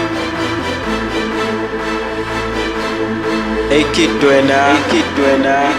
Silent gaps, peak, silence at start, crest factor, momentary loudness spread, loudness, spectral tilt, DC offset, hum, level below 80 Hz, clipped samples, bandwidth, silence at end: none; 0 dBFS; 0 s; 14 dB; 8 LU; -15 LUFS; -4.5 dB/octave; under 0.1%; none; -34 dBFS; under 0.1%; 15 kHz; 0 s